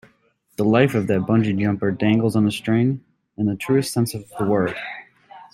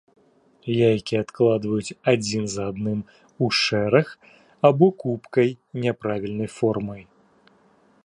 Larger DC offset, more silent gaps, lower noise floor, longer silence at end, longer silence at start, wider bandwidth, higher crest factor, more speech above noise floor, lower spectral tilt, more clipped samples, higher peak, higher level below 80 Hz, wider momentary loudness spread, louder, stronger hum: neither; neither; first, -62 dBFS vs -58 dBFS; second, 0.1 s vs 1.05 s; about the same, 0.6 s vs 0.65 s; first, 15.5 kHz vs 11.5 kHz; about the same, 18 dB vs 20 dB; first, 42 dB vs 36 dB; about the same, -6.5 dB/octave vs -5.5 dB/octave; neither; about the same, -2 dBFS vs -2 dBFS; about the same, -56 dBFS vs -58 dBFS; about the same, 10 LU vs 10 LU; about the same, -21 LUFS vs -23 LUFS; neither